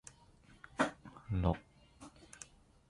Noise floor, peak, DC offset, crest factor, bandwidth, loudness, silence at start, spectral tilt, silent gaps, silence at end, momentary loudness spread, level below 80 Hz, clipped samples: -63 dBFS; -18 dBFS; under 0.1%; 24 dB; 11.5 kHz; -38 LUFS; 0.8 s; -6 dB/octave; none; 0.45 s; 22 LU; -50 dBFS; under 0.1%